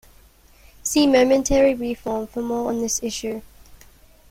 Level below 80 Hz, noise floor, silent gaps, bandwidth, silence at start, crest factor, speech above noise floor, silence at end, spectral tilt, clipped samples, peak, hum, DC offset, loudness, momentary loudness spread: -42 dBFS; -51 dBFS; none; 16.5 kHz; 0.85 s; 16 dB; 31 dB; 0.55 s; -3.5 dB/octave; under 0.1%; -6 dBFS; none; under 0.1%; -21 LUFS; 13 LU